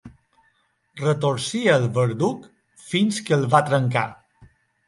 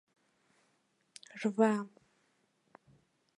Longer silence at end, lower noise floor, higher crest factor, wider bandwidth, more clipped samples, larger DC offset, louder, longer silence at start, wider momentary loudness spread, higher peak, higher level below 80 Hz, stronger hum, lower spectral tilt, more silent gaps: second, 0.4 s vs 1.5 s; second, -66 dBFS vs -76 dBFS; about the same, 20 dB vs 24 dB; about the same, 11.5 kHz vs 11.5 kHz; neither; neither; first, -21 LUFS vs -32 LUFS; second, 0.05 s vs 1.35 s; second, 8 LU vs 22 LU; first, -2 dBFS vs -14 dBFS; first, -62 dBFS vs -86 dBFS; neither; about the same, -5.5 dB/octave vs -6.5 dB/octave; neither